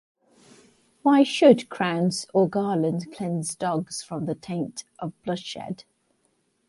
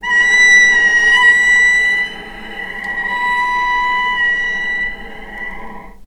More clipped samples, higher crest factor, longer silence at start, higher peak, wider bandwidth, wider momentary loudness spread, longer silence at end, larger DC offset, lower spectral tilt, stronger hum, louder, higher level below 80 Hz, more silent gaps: neither; first, 22 dB vs 14 dB; first, 1.05 s vs 0 s; second, -4 dBFS vs 0 dBFS; about the same, 11.5 kHz vs 12.5 kHz; second, 16 LU vs 20 LU; first, 0.85 s vs 0 s; neither; first, -5.5 dB/octave vs 0 dB/octave; neither; second, -24 LUFS vs -11 LUFS; second, -68 dBFS vs -40 dBFS; neither